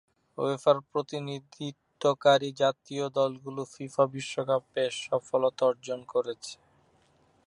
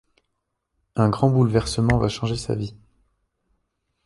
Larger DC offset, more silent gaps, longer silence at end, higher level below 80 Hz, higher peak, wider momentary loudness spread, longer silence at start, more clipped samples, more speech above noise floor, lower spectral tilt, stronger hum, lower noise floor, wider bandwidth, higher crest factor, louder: neither; neither; second, 0.95 s vs 1.3 s; second, -78 dBFS vs -42 dBFS; second, -10 dBFS vs -4 dBFS; first, 15 LU vs 10 LU; second, 0.4 s vs 0.95 s; neither; second, 37 dB vs 56 dB; second, -5 dB/octave vs -6.5 dB/octave; neither; second, -65 dBFS vs -77 dBFS; about the same, 11 kHz vs 11.5 kHz; about the same, 20 dB vs 20 dB; second, -29 LUFS vs -22 LUFS